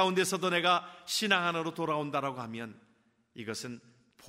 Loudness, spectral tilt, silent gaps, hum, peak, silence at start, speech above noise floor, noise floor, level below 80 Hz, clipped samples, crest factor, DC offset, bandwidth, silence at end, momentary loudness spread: -31 LUFS; -3.5 dB/octave; none; none; -10 dBFS; 0 s; 38 dB; -70 dBFS; -78 dBFS; under 0.1%; 22 dB; under 0.1%; 16 kHz; 0 s; 17 LU